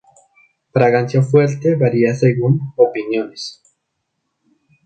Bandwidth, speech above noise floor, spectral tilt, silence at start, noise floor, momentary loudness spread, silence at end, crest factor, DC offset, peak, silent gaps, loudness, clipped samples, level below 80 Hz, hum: 9 kHz; 58 dB; -7.5 dB/octave; 0.75 s; -73 dBFS; 8 LU; 1.3 s; 16 dB; under 0.1%; 0 dBFS; none; -16 LUFS; under 0.1%; -60 dBFS; none